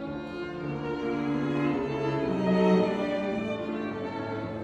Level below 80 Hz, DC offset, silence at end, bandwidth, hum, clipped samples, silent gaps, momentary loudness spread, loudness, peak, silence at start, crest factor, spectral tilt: -56 dBFS; under 0.1%; 0 s; 8.2 kHz; none; under 0.1%; none; 10 LU; -29 LUFS; -12 dBFS; 0 s; 16 dB; -8 dB/octave